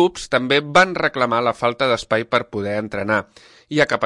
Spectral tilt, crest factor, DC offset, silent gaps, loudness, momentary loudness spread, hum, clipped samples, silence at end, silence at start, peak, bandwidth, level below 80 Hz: -4.5 dB/octave; 16 dB; under 0.1%; none; -19 LUFS; 9 LU; none; under 0.1%; 0 s; 0 s; -2 dBFS; 11.5 kHz; -52 dBFS